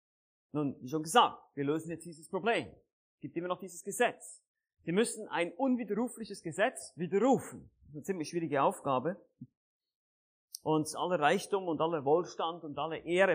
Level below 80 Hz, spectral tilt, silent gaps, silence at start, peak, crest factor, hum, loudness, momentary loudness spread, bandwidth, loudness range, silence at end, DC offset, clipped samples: -76 dBFS; -4.5 dB/octave; 2.93-3.18 s, 4.48-4.55 s, 9.57-9.80 s, 9.95-10.48 s; 0.55 s; -12 dBFS; 22 dB; none; -33 LUFS; 15 LU; 15.5 kHz; 3 LU; 0 s; under 0.1%; under 0.1%